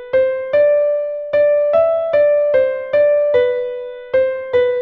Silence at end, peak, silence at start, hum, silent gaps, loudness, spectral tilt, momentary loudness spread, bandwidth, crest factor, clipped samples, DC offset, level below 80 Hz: 0 s; -4 dBFS; 0 s; none; none; -15 LUFS; -6.5 dB/octave; 6 LU; 4.5 kHz; 12 dB; under 0.1%; under 0.1%; -54 dBFS